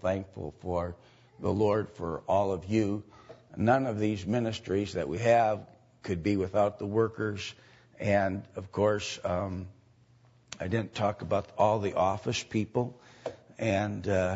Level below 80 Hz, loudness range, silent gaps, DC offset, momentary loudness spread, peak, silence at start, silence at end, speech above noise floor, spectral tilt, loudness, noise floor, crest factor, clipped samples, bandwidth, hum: -58 dBFS; 3 LU; none; under 0.1%; 13 LU; -12 dBFS; 0 s; 0 s; 32 dB; -6.5 dB/octave; -30 LUFS; -61 dBFS; 18 dB; under 0.1%; 8 kHz; none